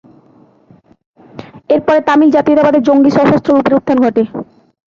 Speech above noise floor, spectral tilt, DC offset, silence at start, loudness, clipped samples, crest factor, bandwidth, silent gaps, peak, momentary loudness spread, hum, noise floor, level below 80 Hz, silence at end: 37 dB; -7.5 dB/octave; under 0.1%; 1.35 s; -11 LUFS; under 0.1%; 12 dB; 7.2 kHz; none; 0 dBFS; 7 LU; none; -47 dBFS; -50 dBFS; 0.45 s